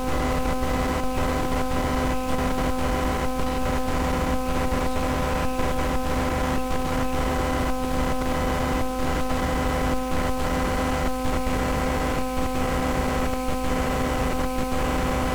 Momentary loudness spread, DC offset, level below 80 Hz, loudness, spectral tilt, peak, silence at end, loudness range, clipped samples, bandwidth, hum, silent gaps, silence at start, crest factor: 2 LU; under 0.1%; -30 dBFS; -25 LUFS; -5.5 dB/octave; -12 dBFS; 0 s; 0 LU; under 0.1%; over 20 kHz; none; none; 0 s; 12 dB